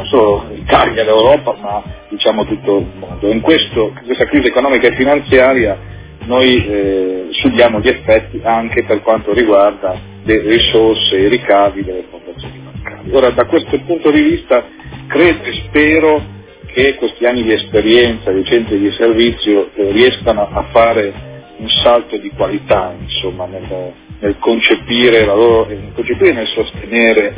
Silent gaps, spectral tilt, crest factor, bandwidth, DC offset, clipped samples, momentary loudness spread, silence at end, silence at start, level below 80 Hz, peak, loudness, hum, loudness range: none; -9 dB/octave; 12 dB; 4 kHz; under 0.1%; 0.4%; 14 LU; 0 s; 0 s; -34 dBFS; 0 dBFS; -12 LUFS; none; 2 LU